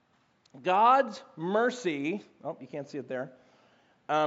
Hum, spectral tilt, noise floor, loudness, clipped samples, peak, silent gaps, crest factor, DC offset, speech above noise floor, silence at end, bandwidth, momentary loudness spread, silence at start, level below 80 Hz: none; -3.5 dB/octave; -68 dBFS; -29 LUFS; under 0.1%; -12 dBFS; none; 20 dB; under 0.1%; 39 dB; 0 s; 8 kHz; 18 LU; 0.55 s; -88 dBFS